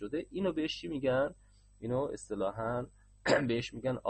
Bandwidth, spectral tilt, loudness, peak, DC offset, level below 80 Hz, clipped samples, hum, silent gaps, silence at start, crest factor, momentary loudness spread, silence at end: 8.4 kHz; -5.5 dB/octave; -34 LUFS; -14 dBFS; under 0.1%; -60 dBFS; under 0.1%; none; none; 0 s; 20 dB; 8 LU; 0 s